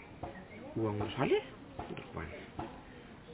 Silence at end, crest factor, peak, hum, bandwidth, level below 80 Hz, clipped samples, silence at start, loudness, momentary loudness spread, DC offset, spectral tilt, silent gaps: 0 s; 22 dB; -18 dBFS; none; 4 kHz; -58 dBFS; under 0.1%; 0 s; -39 LUFS; 16 LU; under 0.1%; -5.5 dB/octave; none